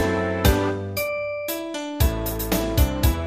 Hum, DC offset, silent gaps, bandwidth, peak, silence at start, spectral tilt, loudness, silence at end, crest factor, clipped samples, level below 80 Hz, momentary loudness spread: none; under 0.1%; none; 15.5 kHz; -4 dBFS; 0 s; -5.5 dB/octave; -23 LUFS; 0 s; 18 dB; under 0.1%; -28 dBFS; 8 LU